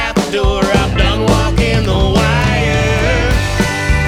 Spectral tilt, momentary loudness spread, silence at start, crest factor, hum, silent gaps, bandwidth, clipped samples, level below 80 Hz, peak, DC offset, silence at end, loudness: -5.5 dB/octave; 3 LU; 0 s; 10 dB; none; none; 15.5 kHz; under 0.1%; -18 dBFS; -2 dBFS; under 0.1%; 0 s; -13 LUFS